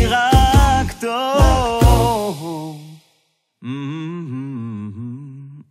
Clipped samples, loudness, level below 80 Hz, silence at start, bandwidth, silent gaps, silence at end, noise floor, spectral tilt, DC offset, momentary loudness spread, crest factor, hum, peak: under 0.1%; -17 LUFS; -22 dBFS; 0 s; 16 kHz; none; 0.1 s; -65 dBFS; -5.5 dB/octave; under 0.1%; 20 LU; 16 dB; none; -2 dBFS